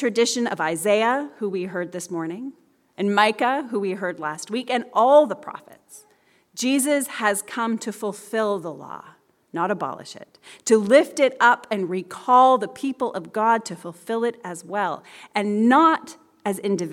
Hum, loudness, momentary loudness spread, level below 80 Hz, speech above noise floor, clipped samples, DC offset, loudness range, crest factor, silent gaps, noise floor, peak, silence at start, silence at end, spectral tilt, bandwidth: none; -22 LUFS; 18 LU; -78 dBFS; 38 dB; under 0.1%; under 0.1%; 6 LU; 20 dB; none; -60 dBFS; -2 dBFS; 0 s; 0 s; -4 dB/octave; 16.5 kHz